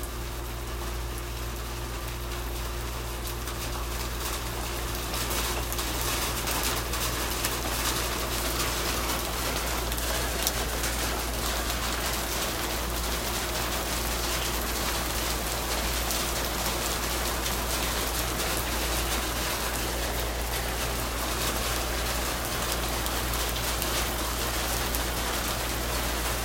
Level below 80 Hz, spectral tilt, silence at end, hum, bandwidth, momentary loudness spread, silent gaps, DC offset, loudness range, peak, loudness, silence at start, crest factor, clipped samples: -34 dBFS; -2.5 dB/octave; 0 s; none; 16.5 kHz; 6 LU; none; under 0.1%; 4 LU; -4 dBFS; -29 LUFS; 0 s; 26 dB; under 0.1%